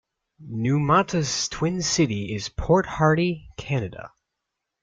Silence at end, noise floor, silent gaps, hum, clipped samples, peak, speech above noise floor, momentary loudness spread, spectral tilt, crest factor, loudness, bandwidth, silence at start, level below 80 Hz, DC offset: 0.75 s; -82 dBFS; none; none; under 0.1%; -6 dBFS; 59 dB; 11 LU; -5 dB/octave; 18 dB; -23 LUFS; 9.4 kHz; 0.4 s; -44 dBFS; under 0.1%